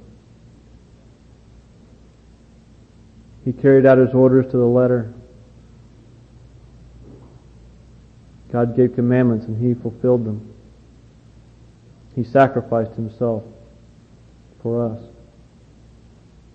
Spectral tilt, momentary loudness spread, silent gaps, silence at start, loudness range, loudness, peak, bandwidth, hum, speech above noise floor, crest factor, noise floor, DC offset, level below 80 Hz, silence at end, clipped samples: -10.5 dB/octave; 15 LU; none; 3.45 s; 11 LU; -18 LUFS; -2 dBFS; 5.8 kHz; none; 32 dB; 20 dB; -48 dBFS; under 0.1%; -50 dBFS; 1.5 s; under 0.1%